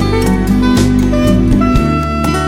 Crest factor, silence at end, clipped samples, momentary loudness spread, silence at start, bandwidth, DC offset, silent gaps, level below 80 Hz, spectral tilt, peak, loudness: 10 dB; 0 s; under 0.1%; 3 LU; 0 s; 16 kHz; under 0.1%; none; -18 dBFS; -6.5 dB/octave; 0 dBFS; -12 LUFS